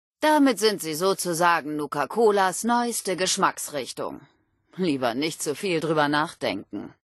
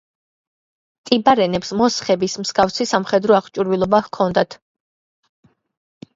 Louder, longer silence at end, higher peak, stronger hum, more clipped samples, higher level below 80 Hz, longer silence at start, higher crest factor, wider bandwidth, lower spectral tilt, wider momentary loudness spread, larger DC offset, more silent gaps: second, -24 LUFS vs -18 LUFS; second, 0.1 s vs 1.6 s; second, -6 dBFS vs 0 dBFS; neither; neither; second, -70 dBFS vs -54 dBFS; second, 0.2 s vs 1.05 s; about the same, 18 dB vs 20 dB; first, 12.5 kHz vs 7.8 kHz; about the same, -3.5 dB/octave vs -4.5 dB/octave; first, 11 LU vs 5 LU; neither; neither